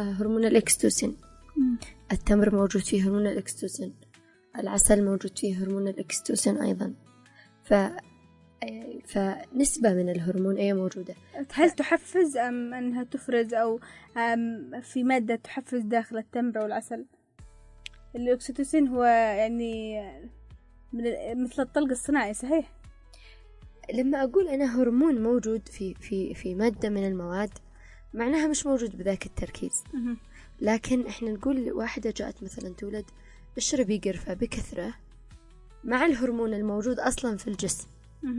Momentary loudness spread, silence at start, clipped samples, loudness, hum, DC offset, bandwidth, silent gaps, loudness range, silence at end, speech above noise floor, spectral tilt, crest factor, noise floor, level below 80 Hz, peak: 15 LU; 0 s; under 0.1%; -27 LUFS; none; under 0.1%; 11.5 kHz; none; 5 LU; 0 s; 32 dB; -4.5 dB/octave; 22 dB; -59 dBFS; -48 dBFS; -6 dBFS